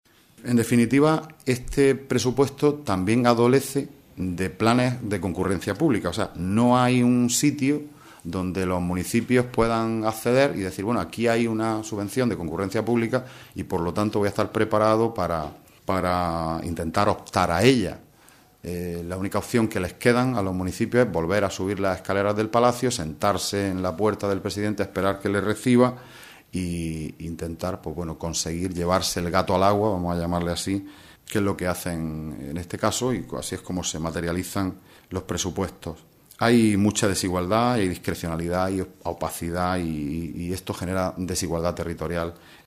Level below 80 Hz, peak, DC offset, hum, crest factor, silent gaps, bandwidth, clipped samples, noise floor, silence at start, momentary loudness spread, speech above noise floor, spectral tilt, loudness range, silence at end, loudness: -48 dBFS; -2 dBFS; under 0.1%; none; 22 dB; none; 15.5 kHz; under 0.1%; -54 dBFS; 0.4 s; 11 LU; 31 dB; -5.5 dB/octave; 5 LU; 0.1 s; -24 LUFS